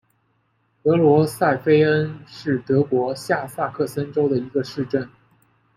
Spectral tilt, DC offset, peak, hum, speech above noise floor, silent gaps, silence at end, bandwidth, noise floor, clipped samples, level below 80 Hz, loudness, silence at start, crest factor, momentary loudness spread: -7 dB/octave; under 0.1%; -4 dBFS; none; 46 dB; none; 0.7 s; 15 kHz; -66 dBFS; under 0.1%; -60 dBFS; -21 LUFS; 0.85 s; 16 dB; 10 LU